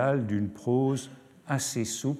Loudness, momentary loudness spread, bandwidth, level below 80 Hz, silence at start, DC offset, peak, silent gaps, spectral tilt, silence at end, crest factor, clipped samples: -29 LUFS; 11 LU; 15 kHz; -66 dBFS; 0 s; under 0.1%; -14 dBFS; none; -5.5 dB/octave; 0 s; 16 dB; under 0.1%